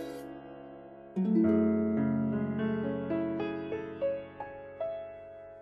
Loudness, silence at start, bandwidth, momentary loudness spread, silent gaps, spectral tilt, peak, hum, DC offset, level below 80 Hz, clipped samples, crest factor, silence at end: -32 LUFS; 0 s; 5 kHz; 20 LU; none; -9.5 dB/octave; -16 dBFS; none; under 0.1%; -66 dBFS; under 0.1%; 16 dB; 0 s